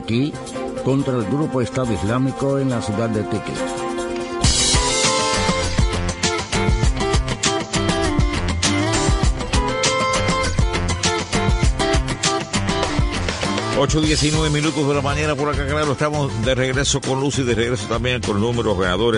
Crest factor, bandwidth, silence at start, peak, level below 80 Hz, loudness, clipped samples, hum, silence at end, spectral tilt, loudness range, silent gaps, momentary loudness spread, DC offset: 18 dB; 11 kHz; 0 s; -2 dBFS; -28 dBFS; -19 LUFS; under 0.1%; none; 0 s; -4 dB/octave; 3 LU; none; 5 LU; under 0.1%